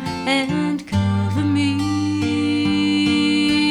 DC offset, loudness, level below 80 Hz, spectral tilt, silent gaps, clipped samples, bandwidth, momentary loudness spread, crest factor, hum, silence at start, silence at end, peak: under 0.1%; -19 LUFS; -48 dBFS; -5.5 dB/octave; none; under 0.1%; 11.5 kHz; 4 LU; 14 dB; none; 0 s; 0 s; -6 dBFS